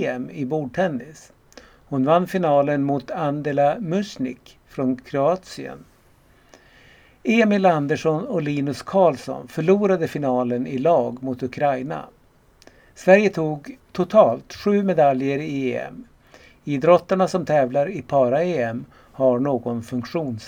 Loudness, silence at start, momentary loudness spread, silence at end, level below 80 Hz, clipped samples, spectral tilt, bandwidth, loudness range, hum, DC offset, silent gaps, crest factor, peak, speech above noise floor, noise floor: -21 LUFS; 0 s; 13 LU; 0 s; -58 dBFS; under 0.1%; -7 dB/octave; 16 kHz; 4 LU; none; under 0.1%; none; 22 dB; 0 dBFS; 34 dB; -55 dBFS